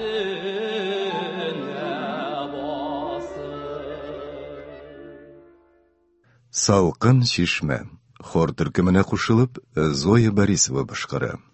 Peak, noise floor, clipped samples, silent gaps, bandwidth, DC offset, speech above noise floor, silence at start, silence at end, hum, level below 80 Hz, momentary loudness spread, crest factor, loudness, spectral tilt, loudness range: -2 dBFS; -62 dBFS; under 0.1%; none; 8.6 kHz; under 0.1%; 42 dB; 0 s; 0.15 s; none; -44 dBFS; 17 LU; 20 dB; -23 LUFS; -5 dB/octave; 13 LU